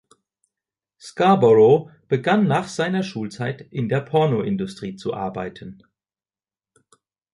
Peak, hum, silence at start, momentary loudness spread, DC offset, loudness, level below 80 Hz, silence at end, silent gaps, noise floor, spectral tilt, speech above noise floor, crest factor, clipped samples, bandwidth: -4 dBFS; none; 1.05 s; 16 LU; under 0.1%; -20 LUFS; -60 dBFS; 1.6 s; none; under -90 dBFS; -7 dB/octave; over 70 dB; 18 dB; under 0.1%; 11.5 kHz